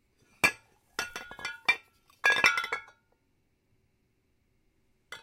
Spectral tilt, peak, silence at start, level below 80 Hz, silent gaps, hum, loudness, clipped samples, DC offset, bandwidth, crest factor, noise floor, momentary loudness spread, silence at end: -0.5 dB/octave; -6 dBFS; 0.45 s; -68 dBFS; none; none; -28 LUFS; under 0.1%; under 0.1%; 16.5 kHz; 28 dB; -73 dBFS; 16 LU; 0.05 s